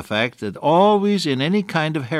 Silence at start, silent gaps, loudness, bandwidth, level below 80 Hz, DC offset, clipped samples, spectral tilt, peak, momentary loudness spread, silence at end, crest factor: 0 s; none; -19 LUFS; 13.5 kHz; -64 dBFS; under 0.1%; under 0.1%; -6 dB/octave; -4 dBFS; 8 LU; 0 s; 16 dB